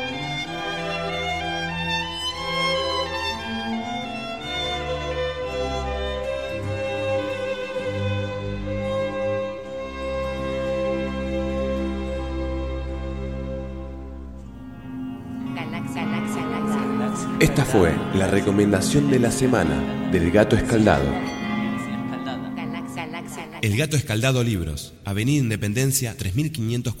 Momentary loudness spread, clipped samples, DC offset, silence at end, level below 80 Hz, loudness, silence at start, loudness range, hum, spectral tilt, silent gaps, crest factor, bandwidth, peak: 12 LU; under 0.1%; under 0.1%; 0 s; -38 dBFS; -24 LUFS; 0 s; 9 LU; none; -5 dB/octave; none; 22 dB; 16 kHz; -2 dBFS